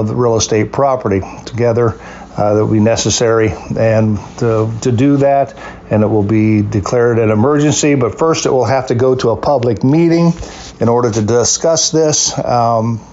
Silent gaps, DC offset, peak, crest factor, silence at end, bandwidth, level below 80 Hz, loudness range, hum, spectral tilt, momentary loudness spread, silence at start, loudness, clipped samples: none; under 0.1%; -2 dBFS; 10 dB; 0.05 s; 8 kHz; -40 dBFS; 2 LU; none; -5 dB/octave; 6 LU; 0 s; -13 LUFS; under 0.1%